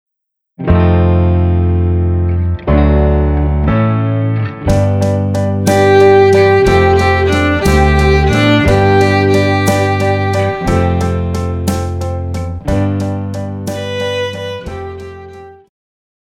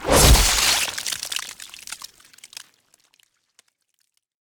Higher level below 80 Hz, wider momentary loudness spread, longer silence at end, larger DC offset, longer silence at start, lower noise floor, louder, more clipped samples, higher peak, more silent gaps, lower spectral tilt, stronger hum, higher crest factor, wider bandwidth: first, -22 dBFS vs -28 dBFS; second, 12 LU vs 27 LU; second, 0.75 s vs 2.5 s; neither; first, 0.6 s vs 0 s; first, -76 dBFS vs -71 dBFS; first, -12 LUFS vs -18 LUFS; neither; about the same, 0 dBFS vs -2 dBFS; neither; first, -7 dB/octave vs -2.5 dB/octave; neither; second, 12 dB vs 20 dB; second, 14.5 kHz vs over 20 kHz